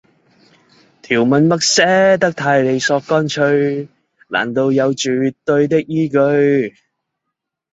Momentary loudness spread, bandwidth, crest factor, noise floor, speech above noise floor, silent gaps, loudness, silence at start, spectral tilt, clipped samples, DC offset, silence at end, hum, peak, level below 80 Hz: 8 LU; 8 kHz; 14 dB; -78 dBFS; 64 dB; none; -15 LUFS; 1.1 s; -4.5 dB/octave; under 0.1%; under 0.1%; 1.05 s; none; 0 dBFS; -58 dBFS